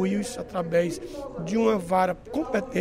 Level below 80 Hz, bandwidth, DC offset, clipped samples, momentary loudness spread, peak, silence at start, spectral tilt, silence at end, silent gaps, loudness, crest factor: -50 dBFS; 16 kHz; under 0.1%; under 0.1%; 10 LU; -10 dBFS; 0 s; -6 dB/octave; 0 s; none; -27 LUFS; 16 dB